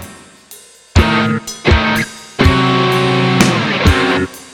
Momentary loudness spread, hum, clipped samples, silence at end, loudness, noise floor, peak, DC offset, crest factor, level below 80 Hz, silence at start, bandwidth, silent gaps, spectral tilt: 6 LU; none; under 0.1%; 0.05 s; -13 LUFS; -40 dBFS; 0 dBFS; under 0.1%; 14 dB; -24 dBFS; 0 s; 18 kHz; none; -5 dB/octave